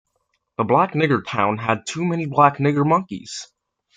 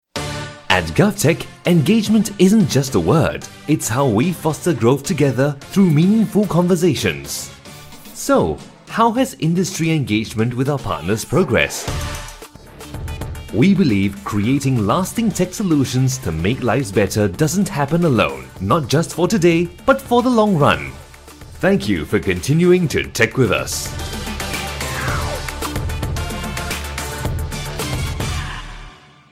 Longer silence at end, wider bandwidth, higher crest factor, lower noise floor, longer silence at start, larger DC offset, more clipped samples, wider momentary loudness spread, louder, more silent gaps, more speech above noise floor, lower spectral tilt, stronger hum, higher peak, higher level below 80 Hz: first, 0.5 s vs 0.35 s; second, 9.4 kHz vs 16.5 kHz; about the same, 20 dB vs 18 dB; first, -71 dBFS vs -40 dBFS; first, 0.6 s vs 0.15 s; neither; neither; first, 15 LU vs 12 LU; about the same, -19 LUFS vs -18 LUFS; neither; first, 52 dB vs 24 dB; about the same, -6 dB/octave vs -5.5 dB/octave; neither; about the same, -2 dBFS vs 0 dBFS; second, -62 dBFS vs -36 dBFS